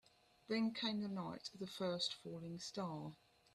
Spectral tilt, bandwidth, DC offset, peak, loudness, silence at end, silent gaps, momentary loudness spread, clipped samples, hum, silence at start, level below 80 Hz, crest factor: -5 dB/octave; 13 kHz; under 0.1%; -28 dBFS; -44 LUFS; 0.4 s; none; 10 LU; under 0.1%; none; 0.5 s; -80 dBFS; 18 dB